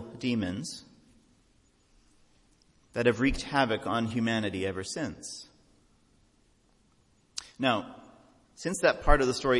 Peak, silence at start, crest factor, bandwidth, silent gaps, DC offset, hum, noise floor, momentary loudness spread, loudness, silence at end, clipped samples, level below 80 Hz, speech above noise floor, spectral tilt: -8 dBFS; 0 s; 24 dB; 11.5 kHz; none; under 0.1%; none; -66 dBFS; 16 LU; -30 LUFS; 0 s; under 0.1%; -40 dBFS; 38 dB; -4.5 dB/octave